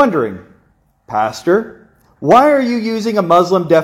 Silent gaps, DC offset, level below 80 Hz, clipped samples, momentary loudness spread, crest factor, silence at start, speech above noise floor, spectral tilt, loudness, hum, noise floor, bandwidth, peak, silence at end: none; under 0.1%; -54 dBFS; under 0.1%; 13 LU; 14 dB; 0 s; 43 dB; -6 dB/octave; -14 LUFS; none; -56 dBFS; 16.5 kHz; 0 dBFS; 0 s